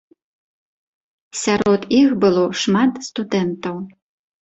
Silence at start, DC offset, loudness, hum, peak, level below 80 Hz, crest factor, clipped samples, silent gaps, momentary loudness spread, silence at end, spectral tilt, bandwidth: 1.35 s; under 0.1%; -18 LUFS; none; -4 dBFS; -56 dBFS; 16 dB; under 0.1%; none; 14 LU; 0.5 s; -5 dB/octave; 8.2 kHz